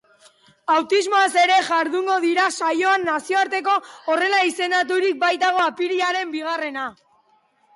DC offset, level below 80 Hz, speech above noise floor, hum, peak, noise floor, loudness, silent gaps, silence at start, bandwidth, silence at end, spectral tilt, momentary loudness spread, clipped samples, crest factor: under 0.1%; -74 dBFS; 41 dB; none; -8 dBFS; -61 dBFS; -20 LUFS; none; 0.7 s; 11.5 kHz; 0.85 s; -1.5 dB/octave; 9 LU; under 0.1%; 12 dB